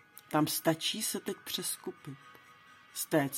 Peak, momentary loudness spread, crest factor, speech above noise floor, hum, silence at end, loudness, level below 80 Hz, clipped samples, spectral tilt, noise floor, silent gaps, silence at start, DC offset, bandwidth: -14 dBFS; 16 LU; 22 dB; 24 dB; none; 0 s; -33 LUFS; -78 dBFS; under 0.1%; -3.5 dB/octave; -58 dBFS; none; 0.15 s; under 0.1%; 17 kHz